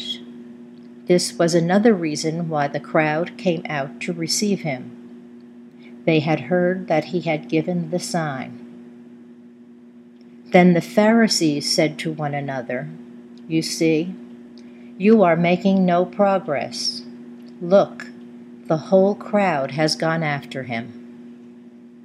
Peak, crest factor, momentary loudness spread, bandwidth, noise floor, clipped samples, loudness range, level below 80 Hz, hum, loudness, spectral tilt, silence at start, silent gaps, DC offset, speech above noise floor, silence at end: 0 dBFS; 22 dB; 23 LU; 14 kHz; -45 dBFS; under 0.1%; 5 LU; -72 dBFS; none; -20 LUFS; -5.5 dB/octave; 0 s; none; under 0.1%; 26 dB; 0.15 s